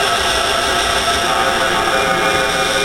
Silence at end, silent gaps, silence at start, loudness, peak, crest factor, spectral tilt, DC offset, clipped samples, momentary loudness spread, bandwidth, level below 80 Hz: 0 s; none; 0 s; -14 LUFS; -2 dBFS; 14 dB; -2 dB/octave; 0.3%; under 0.1%; 0 LU; 16.5 kHz; -36 dBFS